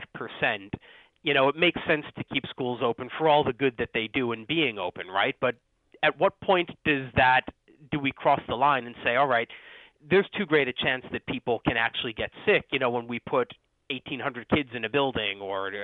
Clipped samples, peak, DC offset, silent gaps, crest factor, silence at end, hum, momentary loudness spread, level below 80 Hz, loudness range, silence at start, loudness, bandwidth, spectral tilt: under 0.1%; -8 dBFS; under 0.1%; none; 18 dB; 0 s; none; 10 LU; -56 dBFS; 3 LU; 0 s; -26 LUFS; 4.4 kHz; -8 dB/octave